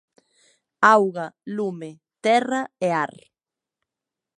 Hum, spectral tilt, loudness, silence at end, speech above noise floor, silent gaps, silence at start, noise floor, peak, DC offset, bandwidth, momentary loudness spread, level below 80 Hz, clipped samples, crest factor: none; -5 dB/octave; -22 LUFS; 1.3 s; 67 dB; none; 0.8 s; -89 dBFS; -2 dBFS; under 0.1%; 11.5 kHz; 16 LU; -74 dBFS; under 0.1%; 22 dB